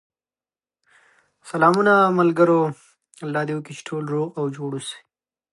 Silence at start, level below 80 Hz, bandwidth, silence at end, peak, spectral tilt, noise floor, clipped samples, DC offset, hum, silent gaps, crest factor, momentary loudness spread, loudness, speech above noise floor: 1.45 s; -72 dBFS; 11.5 kHz; 0.55 s; -2 dBFS; -6.5 dB/octave; under -90 dBFS; under 0.1%; under 0.1%; none; none; 20 dB; 16 LU; -21 LUFS; over 70 dB